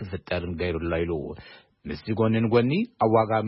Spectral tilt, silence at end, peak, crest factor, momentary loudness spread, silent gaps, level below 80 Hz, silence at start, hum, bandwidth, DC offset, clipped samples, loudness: -11.5 dB/octave; 0 s; -8 dBFS; 16 dB; 16 LU; none; -48 dBFS; 0 s; none; 5.8 kHz; under 0.1%; under 0.1%; -25 LUFS